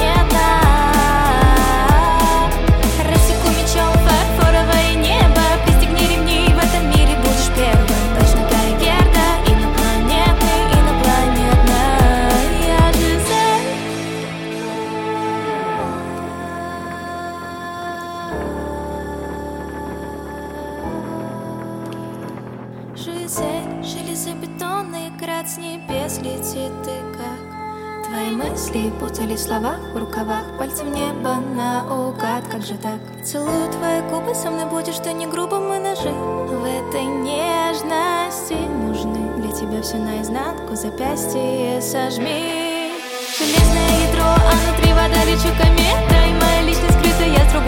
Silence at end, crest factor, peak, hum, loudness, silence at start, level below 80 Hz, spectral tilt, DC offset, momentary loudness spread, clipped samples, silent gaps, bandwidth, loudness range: 0 s; 14 dB; -2 dBFS; none; -18 LUFS; 0 s; -20 dBFS; -5 dB/octave; under 0.1%; 14 LU; under 0.1%; none; 17 kHz; 12 LU